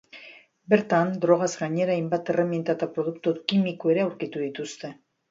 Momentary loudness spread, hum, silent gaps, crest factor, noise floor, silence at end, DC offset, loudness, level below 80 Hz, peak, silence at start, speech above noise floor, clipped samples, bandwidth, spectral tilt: 13 LU; none; none; 20 dB; -49 dBFS; 0.35 s; under 0.1%; -25 LUFS; -72 dBFS; -6 dBFS; 0.15 s; 25 dB; under 0.1%; 7.8 kHz; -6 dB/octave